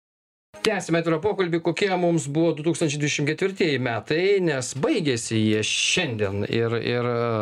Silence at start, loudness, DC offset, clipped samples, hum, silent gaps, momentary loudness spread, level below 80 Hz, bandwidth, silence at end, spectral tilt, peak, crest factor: 0.55 s; -23 LUFS; under 0.1%; under 0.1%; none; none; 4 LU; -62 dBFS; 12.5 kHz; 0 s; -4.5 dB/octave; -4 dBFS; 20 dB